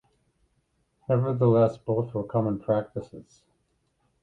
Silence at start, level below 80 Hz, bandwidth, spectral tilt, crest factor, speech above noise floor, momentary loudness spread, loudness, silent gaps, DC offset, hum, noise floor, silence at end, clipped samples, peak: 1.1 s; -60 dBFS; 7.4 kHz; -10.5 dB/octave; 18 dB; 47 dB; 17 LU; -25 LUFS; none; under 0.1%; none; -72 dBFS; 1 s; under 0.1%; -8 dBFS